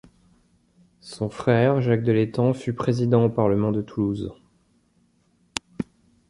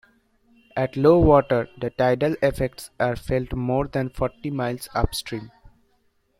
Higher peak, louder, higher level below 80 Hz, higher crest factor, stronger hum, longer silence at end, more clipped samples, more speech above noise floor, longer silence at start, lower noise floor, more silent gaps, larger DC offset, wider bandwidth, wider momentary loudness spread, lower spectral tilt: about the same, -2 dBFS vs -4 dBFS; about the same, -23 LUFS vs -23 LUFS; second, -54 dBFS vs -38 dBFS; about the same, 22 dB vs 20 dB; neither; second, 0.45 s vs 0.9 s; neither; about the same, 42 dB vs 44 dB; first, 1.05 s vs 0.75 s; about the same, -64 dBFS vs -66 dBFS; neither; neither; second, 11.5 kHz vs 16 kHz; first, 15 LU vs 12 LU; about the same, -7.5 dB/octave vs -6.5 dB/octave